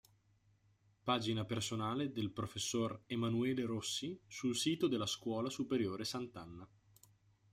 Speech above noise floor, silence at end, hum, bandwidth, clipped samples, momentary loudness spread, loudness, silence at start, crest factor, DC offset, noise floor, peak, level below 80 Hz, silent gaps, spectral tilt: 34 dB; 0.85 s; none; 16 kHz; under 0.1%; 9 LU; -39 LUFS; 1.05 s; 20 dB; under 0.1%; -73 dBFS; -20 dBFS; -72 dBFS; none; -4.5 dB/octave